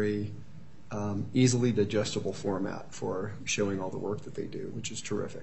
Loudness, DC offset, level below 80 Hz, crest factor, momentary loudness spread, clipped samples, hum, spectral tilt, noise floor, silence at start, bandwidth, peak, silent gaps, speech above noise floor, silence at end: -32 LUFS; 0.7%; -62 dBFS; 20 dB; 12 LU; under 0.1%; none; -5.5 dB/octave; -51 dBFS; 0 s; 8.4 kHz; -10 dBFS; none; 20 dB; 0 s